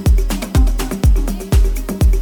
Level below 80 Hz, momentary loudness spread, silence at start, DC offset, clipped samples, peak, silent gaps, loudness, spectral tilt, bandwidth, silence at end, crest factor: -14 dBFS; 3 LU; 0 s; under 0.1%; under 0.1%; -4 dBFS; none; -17 LUFS; -6 dB/octave; 18.5 kHz; 0 s; 10 dB